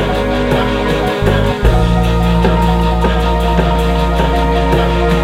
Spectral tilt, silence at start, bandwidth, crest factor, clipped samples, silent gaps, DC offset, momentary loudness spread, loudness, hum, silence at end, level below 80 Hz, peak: -7 dB/octave; 0 s; 14.5 kHz; 12 dB; under 0.1%; none; under 0.1%; 2 LU; -13 LUFS; none; 0 s; -16 dBFS; 0 dBFS